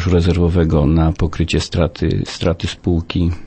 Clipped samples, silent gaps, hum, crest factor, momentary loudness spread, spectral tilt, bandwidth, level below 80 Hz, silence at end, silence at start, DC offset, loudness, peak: under 0.1%; none; none; 14 dB; 5 LU; -7 dB/octave; 8.6 kHz; -26 dBFS; 0 s; 0 s; under 0.1%; -17 LUFS; -2 dBFS